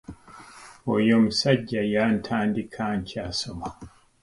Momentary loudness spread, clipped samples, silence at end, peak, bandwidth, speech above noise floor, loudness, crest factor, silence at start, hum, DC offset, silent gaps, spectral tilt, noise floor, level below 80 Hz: 17 LU; under 0.1%; 0.35 s; -6 dBFS; 11.5 kHz; 23 dB; -24 LUFS; 20 dB; 0.1 s; none; under 0.1%; none; -5.5 dB/octave; -47 dBFS; -52 dBFS